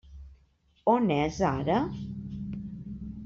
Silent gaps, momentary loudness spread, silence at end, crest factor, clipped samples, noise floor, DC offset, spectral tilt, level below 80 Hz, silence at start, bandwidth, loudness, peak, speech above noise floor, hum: none; 15 LU; 0 s; 20 dB; under 0.1%; -65 dBFS; under 0.1%; -6.5 dB/octave; -50 dBFS; 0.05 s; 7.6 kHz; -29 LUFS; -10 dBFS; 39 dB; none